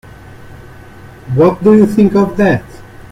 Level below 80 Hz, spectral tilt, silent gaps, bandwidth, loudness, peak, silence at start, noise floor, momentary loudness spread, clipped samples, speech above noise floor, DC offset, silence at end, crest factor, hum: -40 dBFS; -8.5 dB/octave; none; 12 kHz; -11 LUFS; 0 dBFS; 0.35 s; -34 dBFS; 8 LU; under 0.1%; 25 dB; under 0.1%; 0.1 s; 12 dB; none